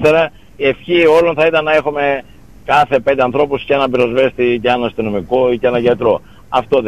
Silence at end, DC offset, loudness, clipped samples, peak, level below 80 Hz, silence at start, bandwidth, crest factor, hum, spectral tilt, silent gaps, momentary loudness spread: 0 s; 0.8%; -14 LUFS; under 0.1%; -2 dBFS; -44 dBFS; 0 s; 12.5 kHz; 12 dB; none; -6.5 dB/octave; none; 8 LU